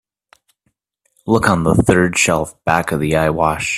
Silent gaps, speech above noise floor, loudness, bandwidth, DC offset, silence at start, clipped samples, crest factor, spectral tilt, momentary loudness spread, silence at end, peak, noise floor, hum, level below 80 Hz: none; 53 dB; -15 LUFS; 14.5 kHz; under 0.1%; 1.25 s; under 0.1%; 16 dB; -5 dB/octave; 5 LU; 0 s; 0 dBFS; -68 dBFS; none; -40 dBFS